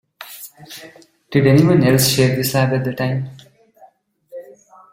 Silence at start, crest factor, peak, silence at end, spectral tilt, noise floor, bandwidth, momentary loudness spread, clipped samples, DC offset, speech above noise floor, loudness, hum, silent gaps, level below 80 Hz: 0.2 s; 16 dB; -2 dBFS; 0.5 s; -5.5 dB/octave; -51 dBFS; 16.5 kHz; 24 LU; under 0.1%; under 0.1%; 35 dB; -15 LUFS; none; none; -50 dBFS